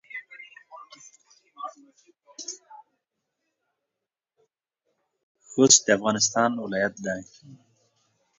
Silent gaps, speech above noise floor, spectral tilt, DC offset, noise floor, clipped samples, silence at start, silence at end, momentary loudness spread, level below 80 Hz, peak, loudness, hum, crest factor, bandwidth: 5.23-5.35 s; 64 dB; -2 dB/octave; under 0.1%; -87 dBFS; under 0.1%; 0.1 s; 0.85 s; 27 LU; -70 dBFS; -2 dBFS; -21 LUFS; none; 28 dB; 7.8 kHz